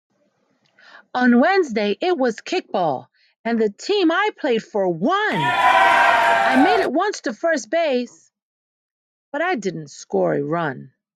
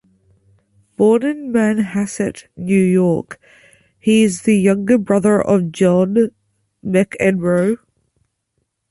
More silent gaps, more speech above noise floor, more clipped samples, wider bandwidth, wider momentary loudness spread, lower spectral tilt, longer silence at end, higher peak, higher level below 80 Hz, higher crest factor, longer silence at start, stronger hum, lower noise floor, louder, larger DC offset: first, 3.38-3.44 s, 8.42-9.32 s vs none; second, 46 dB vs 56 dB; neither; first, 13.5 kHz vs 11.5 kHz; about the same, 11 LU vs 9 LU; second, -4.5 dB/octave vs -6.5 dB/octave; second, 0.3 s vs 1.15 s; about the same, -2 dBFS vs -2 dBFS; second, -64 dBFS vs -54 dBFS; about the same, 18 dB vs 14 dB; first, 1.15 s vs 1 s; neither; second, -65 dBFS vs -71 dBFS; second, -19 LUFS vs -16 LUFS; neither